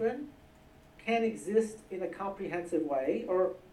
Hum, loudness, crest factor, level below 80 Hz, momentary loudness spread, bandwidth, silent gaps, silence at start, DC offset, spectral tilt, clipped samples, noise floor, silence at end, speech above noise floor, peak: none; -33 LUFS; 18 dB; -64 dBFS; 9 LU; 12.5 kHz; none; 0 s; under 0.1%; -5.5 dB/octave; under 0.1%; -58 dBFS; 0.05 s; 26 dB; -16 dBFS